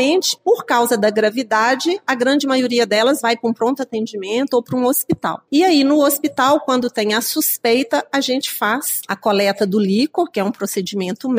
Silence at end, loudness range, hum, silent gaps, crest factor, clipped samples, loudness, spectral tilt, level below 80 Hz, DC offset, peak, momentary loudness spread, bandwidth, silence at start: 0 s; 2 LU; none; none; 14 dB; under 0.1%; -17 LUFS; -3.5 dB/octave; -64 dBFS; under 0.1%; -2 dBFS; 6 LU; 16 kHz; 0 s